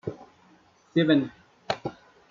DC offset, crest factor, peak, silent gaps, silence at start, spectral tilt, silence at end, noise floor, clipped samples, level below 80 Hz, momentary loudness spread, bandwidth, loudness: under 0.1%; 20 dB; -10 dBFS; none; 0.05 s; -7 dB/octave; 0.4 s; -59 dBFS; under 0.1%; -66 dBFS; 17 LU; 7.4 kHz; -26 LUFS